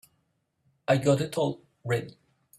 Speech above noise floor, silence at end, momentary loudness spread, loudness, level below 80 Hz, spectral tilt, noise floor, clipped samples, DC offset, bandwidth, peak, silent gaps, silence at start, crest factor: 49 dB; 0.5 s; 16 LU; -27 LUFS; -66 dBFS; -6 dB/octave; -75 dBFS; under 0.1%; under 0.1%; 14 kHz; -10 dBFS; none; 0.9 s; 20 dB